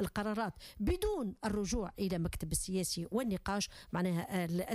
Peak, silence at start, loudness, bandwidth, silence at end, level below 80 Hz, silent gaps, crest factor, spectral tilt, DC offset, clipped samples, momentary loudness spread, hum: -20 dBFS; 0 s; -37 LUFS; 15.5 kHz; 0 s; -48 dBFS; none; 16 dB; -5 dB/octave; under 0.1%; under 0.1%; 3 LU; none